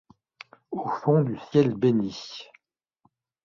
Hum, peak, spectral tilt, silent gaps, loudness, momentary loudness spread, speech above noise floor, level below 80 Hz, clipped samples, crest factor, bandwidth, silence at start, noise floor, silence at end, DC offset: none; -8 dBFS; -8 dB/octave; none; -25 LUFS; 16 LU; 46 dB; -66 dBFS; under 0.1%; 20 dB; 7.2 kHz; 0.7 s; -70 dBFS; 1 s; under 0.1%